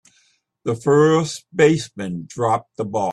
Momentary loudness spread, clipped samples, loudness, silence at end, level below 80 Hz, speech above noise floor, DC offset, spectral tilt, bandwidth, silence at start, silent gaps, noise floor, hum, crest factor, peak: 14 LU; under 0.1%; -19 LUFS; 0 s; -60 dBFS; 43 dB; under 0.1%; -6 dB/octave; 12 kHz; 0.65 s; none; -62 dBFS; none; 16 dB; -4 dBFS